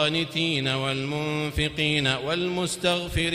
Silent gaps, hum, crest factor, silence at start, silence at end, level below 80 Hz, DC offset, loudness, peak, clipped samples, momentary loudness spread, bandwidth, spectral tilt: none; none; 16 dB; 0 s; 0 s; -42 dBFS; under 0.1%; -25 LUFS; -8 dBFS; under 0.1%; 4 LU; 16 kHz; -4.5 dB/octave